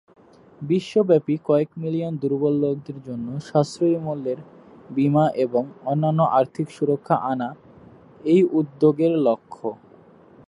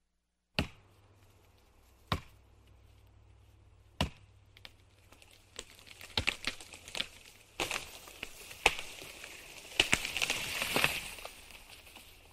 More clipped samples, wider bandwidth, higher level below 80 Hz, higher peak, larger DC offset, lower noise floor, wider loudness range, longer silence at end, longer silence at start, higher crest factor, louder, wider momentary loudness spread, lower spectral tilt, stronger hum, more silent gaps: neither; second, 11 kHz vs 16 kHz; second, -66 dBFS vs -54 dBFS; about the same, -4 dBFS vs -6 dBFS; neither; second, -50 dBFS vs -81 dBFS; second, 2 LU vs 14 LU; first, 0.75 s vs 0 s; about the same, 0.6 s vs 0.55 s; second, 18 dB vs 34 dB; first, -22 LUFS vs -35 LUFS; second, 12 LU vs 22 LU; first, -8.5 dB/octave vs -2 dB/octave; neither; neither